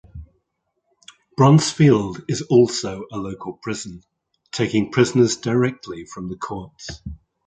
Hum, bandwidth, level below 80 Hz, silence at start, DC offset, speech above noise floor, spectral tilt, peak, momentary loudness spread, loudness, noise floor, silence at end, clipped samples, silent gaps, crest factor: none; 9.4 kHz; -48 dBFS; 0.15 s; under 0.1%; 54 dB; -6 dB/octave; -2 dBFS; 20 LU; -19 LUFS; -74 dBFS; 0.3 s; under 0.1%; none; 18 dB